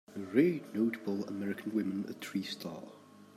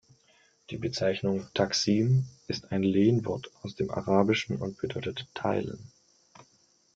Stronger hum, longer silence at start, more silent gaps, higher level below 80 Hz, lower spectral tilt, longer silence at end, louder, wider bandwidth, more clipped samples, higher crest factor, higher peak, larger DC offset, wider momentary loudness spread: neither; second, 0.1 s vs 0.7 s; neither; second, -82 dBFS vs -62 dBFS; about the same, -6.5 dB/octave vs -6 dB/octave; second, 0.1 s vs 0.55 s; second, -35 LUFS vs -29 LUFS; first, 15.5 kHz vs 7.8 kHz; neither; about the same, 22 dB vs 22 dB; second, -14 dBFS vs -8 dBFS; neither; about the same, 13 LU vs 12 LU